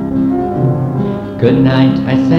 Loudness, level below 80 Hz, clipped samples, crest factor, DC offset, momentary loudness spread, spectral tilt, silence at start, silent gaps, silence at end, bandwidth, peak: -13 LUFS; -38 dBFS; under 0.1%; 12 dB; under 0.1%; 7 LU; -9 dB/octave; 0 s; none; 0 s; 6.2 kHz; 0 dBFS